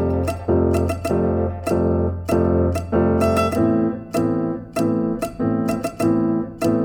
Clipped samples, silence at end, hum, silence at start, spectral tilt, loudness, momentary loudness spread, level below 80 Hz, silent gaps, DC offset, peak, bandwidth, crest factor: under 0.1%; 0 s; none; 0 s; -7.5 dB/octave; -20 LUFS; 5 LU; -36 dBFS; none; under 0.1%; -6 dBFS; 18 kHz; 12 dB